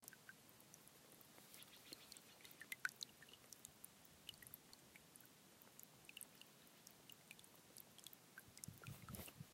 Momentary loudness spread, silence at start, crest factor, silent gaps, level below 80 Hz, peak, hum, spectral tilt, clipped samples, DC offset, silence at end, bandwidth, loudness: 9 LU; 0 s; 34 dB; none; -80 dBFS; -26 dBFS; none; -2 dB/octave; under 0.1%; under 0.1%; 0 s; 16 kHz; -59 LUFS